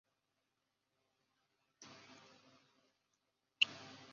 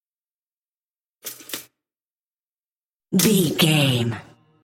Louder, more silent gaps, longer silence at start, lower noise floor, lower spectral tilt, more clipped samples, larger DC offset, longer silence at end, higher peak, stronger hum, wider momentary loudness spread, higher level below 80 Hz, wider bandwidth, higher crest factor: second, -36 LUFS vs -19 LUFS; second, none vs 2.05-2.14 s, 2.20-3.00 s; first, 1.8 s vs 1.25 s; about the same, -87 dBFS vs under -90 dBFS; second, 2 dB/octave vs -4.5 dB/octave; neither; neither; second, 0 s vs 0.4 s; second, -14 dBFS vs -4 dBFS; neither; first, 25 LU vs 18 LU; second, under -90 dBFS vs -64 dBFS; second, 7.2 kHz vs 17 kHz; first, 34 dB vs 20 dB